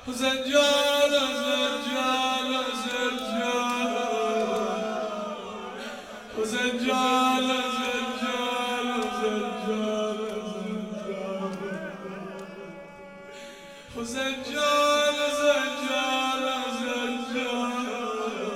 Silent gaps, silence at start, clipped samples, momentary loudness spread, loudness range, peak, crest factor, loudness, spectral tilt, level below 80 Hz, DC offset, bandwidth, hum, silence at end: none; 0 s; under 0.1%; 16 LU; 9 LU; -10 dBFS; 18 dB; -26 LUFS; -2.5 dB/octave; -62 dBFS; under 0.1%; 16 kHz; none; 0 s